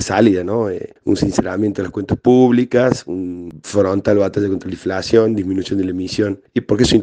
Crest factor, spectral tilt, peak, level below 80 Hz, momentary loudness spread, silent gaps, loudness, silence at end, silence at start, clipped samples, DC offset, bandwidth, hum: 16 dB; -6 dB/octave; 0 dBFS; -44 dBFS; 10 LU; none; -17 LUFS; 0 s; 0 s; under 0.1%; under 0.1%; 9.8 kHz; none